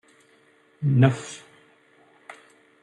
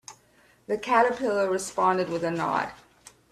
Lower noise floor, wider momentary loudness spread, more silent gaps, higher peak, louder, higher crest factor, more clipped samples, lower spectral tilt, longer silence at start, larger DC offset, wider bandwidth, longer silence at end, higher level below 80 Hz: about the same, -59 dBFS vs -60 dBFS; first, 26 LU vs 9 LU; neither; first, -4 dBFS vs -8 dBFS; first, -22 LUFS vs -26 LUFS; about the same, 24 dB vs 20 dB; neither; first, -7 dB/octave vs -4.5 dB/octave; first, 0.8 s vs 0.1 s; neither; second, 10 kHz vs 14 kHz; about the same, 0.5 s vs 0.55 s; about the same, -66 dBFS vs -64 dBFS